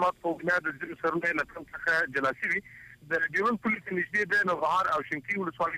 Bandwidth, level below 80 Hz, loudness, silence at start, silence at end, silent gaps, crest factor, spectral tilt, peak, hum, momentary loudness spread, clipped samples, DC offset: 15.5 kHz; -64 dBFS; -28 LUFS; 0 s; 0 s; none; 14 dB; -5.5 dB/octave; -16 dBFS; none; 6 LU; under 0.1%; under 0.1%